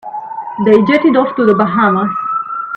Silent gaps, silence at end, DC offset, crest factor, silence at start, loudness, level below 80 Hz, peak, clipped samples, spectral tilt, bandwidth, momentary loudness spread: none; 0 s; under 0.1%; 12 dB; 0.05 s; -12 LUFS; -54 dBFS; 0 dBFS; under 0.1%; -8.5 dB/octave; 6 kHz; 13 LU